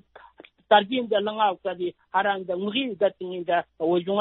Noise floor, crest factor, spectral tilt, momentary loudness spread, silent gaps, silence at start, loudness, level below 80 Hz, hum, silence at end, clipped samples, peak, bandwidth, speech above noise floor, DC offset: -52 dBFS; 20 dB; -9 dB/octave; 9 LU; none; 0.15 s; -25 LUFS; -72 dBFS; none; 0 s; under 0.1%; -6 dBFS; 4.2 kHz; 27 dB; under 0.1%